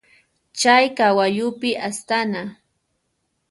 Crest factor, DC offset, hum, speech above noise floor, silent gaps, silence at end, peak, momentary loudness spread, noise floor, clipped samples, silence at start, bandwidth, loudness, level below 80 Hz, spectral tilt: 20 dB; under 0.1%; none; 53 dB; none; 0.95 s; -2 dBFS; 14 LU; -72 dBFS; under 0.1%; 0.55 s; 11.5 kHz; -19 LUFS; -68 dBFS; -3 dB/octave